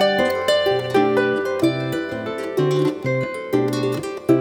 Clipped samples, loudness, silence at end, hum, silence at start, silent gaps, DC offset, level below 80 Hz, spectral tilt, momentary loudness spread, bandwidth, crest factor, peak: under 0.1%; -20 LUFS; 0 s; none; 0 s; none; under 0.1%; -58 dBFS; -6 dB/octave; 7 LU; 18 kHz; 14 dB; -4 dBFS